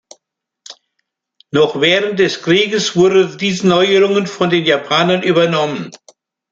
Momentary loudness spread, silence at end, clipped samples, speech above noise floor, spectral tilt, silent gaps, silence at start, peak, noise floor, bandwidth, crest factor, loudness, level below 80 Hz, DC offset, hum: 6 LU; 0.55 s; under 0.1%; 58 dB; -4.5 dB/octave; none; 0.7 s; 0 dBFS; -72 dBFS; 7.8 kHz; 14 dB; -13 LUFS; -58 dBFS; under 0.1%; none